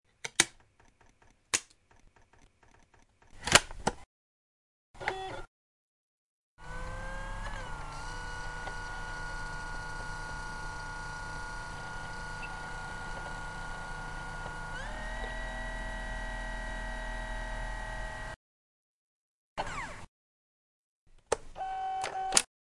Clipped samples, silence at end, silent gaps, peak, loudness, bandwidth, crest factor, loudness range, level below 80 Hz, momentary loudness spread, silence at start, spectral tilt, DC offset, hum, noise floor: under 0.1%; 0.35 s; 4.06-4.94 s, 5.48-6.57 s, 18.36-19.56 s, 20.08-21.07 s; 0 dBFS; -36 LUFS; 11.5 kHz; 38 dB; 11 LU; -46 dBFS; 13 LU; 0.25 s; -1.5 dB/octave; under 0.1%; none; -63 dBFS